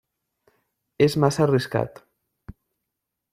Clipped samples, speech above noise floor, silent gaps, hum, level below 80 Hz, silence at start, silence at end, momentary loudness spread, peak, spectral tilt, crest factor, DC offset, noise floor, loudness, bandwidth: under 0.1%; 62 dB; none; none; -56 dBFS; 1 s; 0.8 s; 8 LU; -6 dBFS; -6.5 dB/octave; 20 dB; under 0.1%; -83 dBFS; -22 LUFS; 15.5 kHz